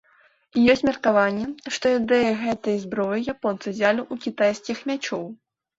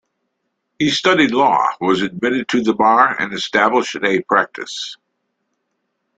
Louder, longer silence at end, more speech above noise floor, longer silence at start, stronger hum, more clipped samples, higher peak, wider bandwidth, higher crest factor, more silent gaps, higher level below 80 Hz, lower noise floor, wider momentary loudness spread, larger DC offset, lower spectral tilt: second, -23 LUFS vs -16 LUFS; second, 0.45 s vs 1.25 s; second, 37 dB vs 57 dB; second, 0.55 s vs 0.8 s; neither; neither; second, -6 dBFS vs 0 dBFS; second, 7.8 kHz vs 9.2 kHz; about the same, 18 dB vs 16 dB; neither; about the same, -58 dBFS vs -58 dBFS; second, -60 dBFS vs -73 dBFS; about the same, 10 LU vs 10 LU; neither; about the same, -5 dB/octave vs -4 dB/octave